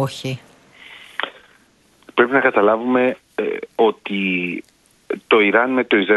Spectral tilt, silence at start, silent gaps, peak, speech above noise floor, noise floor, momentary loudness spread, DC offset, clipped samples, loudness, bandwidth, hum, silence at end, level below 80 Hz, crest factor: -6 dB/octave; 0 s; none; 0 dBFS; 38 dB; -55 dBFS; 15 LU; under 0.1%; under 0.1%; -18 LUFS; 12 kHz; none; 0 s; -66 dBFS; 18 dB